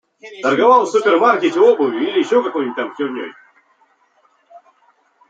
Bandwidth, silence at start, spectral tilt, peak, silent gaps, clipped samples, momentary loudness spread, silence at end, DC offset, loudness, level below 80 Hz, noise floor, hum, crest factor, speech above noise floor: 8.6 kHz; 0.25 s; -4.5 dB/octave; 0 dBFS; none; under 0.1%; 12 LU; 0.7 s; under 0.1%; -15 LUFS; -72 dBFS; -58 dBFS; none; 16 dB; 43 dB